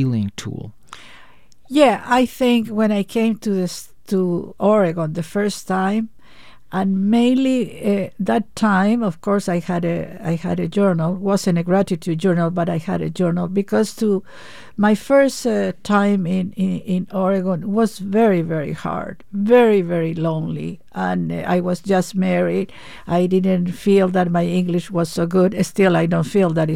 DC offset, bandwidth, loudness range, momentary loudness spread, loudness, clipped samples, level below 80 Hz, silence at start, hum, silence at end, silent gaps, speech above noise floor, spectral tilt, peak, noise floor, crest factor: 1%; 15.5 kHz; 2 LU; 9 LU; -19 LUFS; under 0.1%; -54 dBFS; 0 s; none; 0 s; none; 32 dB; -7 dB/octave; -2 dBFS; -50 dBFS; 18 dB